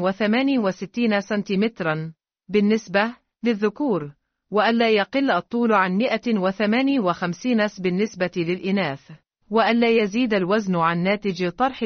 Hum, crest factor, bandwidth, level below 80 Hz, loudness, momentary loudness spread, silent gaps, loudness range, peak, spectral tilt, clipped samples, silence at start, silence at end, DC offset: none; 16 dB; 6.6 kHz; -62 dBFS; -22 LUFS; 7 LU; none; 3 LU; -6 dBFS; -4.5 dB/octave; under 0.1%; 0 s; 0 s; under 0.1%